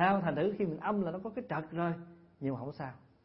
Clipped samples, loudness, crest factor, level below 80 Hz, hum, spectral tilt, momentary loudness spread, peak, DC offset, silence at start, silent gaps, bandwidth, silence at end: under 0.1%; -36 LUFS; 20 dB; -68 dBFS; none; -6 dB/octave; 13 LU; -16 dBFS; under 0.1%; 0 s; none; 5.6 kHz; 0.25 s